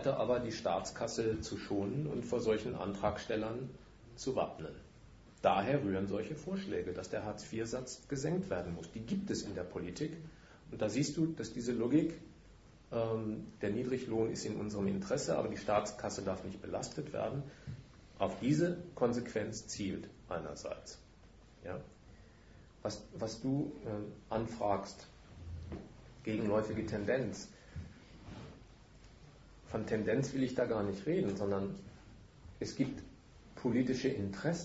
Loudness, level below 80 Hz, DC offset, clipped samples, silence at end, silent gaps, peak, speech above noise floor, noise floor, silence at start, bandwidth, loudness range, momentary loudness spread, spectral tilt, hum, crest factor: -38 LUFS; -60 dBFS; under 0.1%; under 0.1%; 0 s; none; -16 dBFS; 23 dB; -60 dBFS; 0 s; 7.6 kHz; 5 LU; 17 LU; -6 dB/octave; none; 22 dB